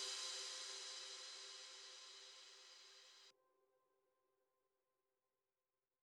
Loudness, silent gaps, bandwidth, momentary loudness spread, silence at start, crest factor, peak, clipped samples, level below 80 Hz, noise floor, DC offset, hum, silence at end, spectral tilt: -51 LUFS; none; 13 kHz; 16 LU; 0 s; 22 dB; -36 dBFS; under 0.1%; under -90 dBFS; under -90 dBFS; under 0.1%; none; 2.7 s; 4.5 dB/octave